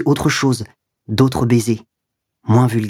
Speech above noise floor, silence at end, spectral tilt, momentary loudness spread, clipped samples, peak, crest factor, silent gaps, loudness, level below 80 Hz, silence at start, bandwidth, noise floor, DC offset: 63 dB; 0 s; -6 dB/octave; 10 LU; under 0.1%; 0 dBFS; 16 dB; none; -17 LUFS; -44 dBFS; 0 s; 16 kHz; -78 dBFS; under 0.1%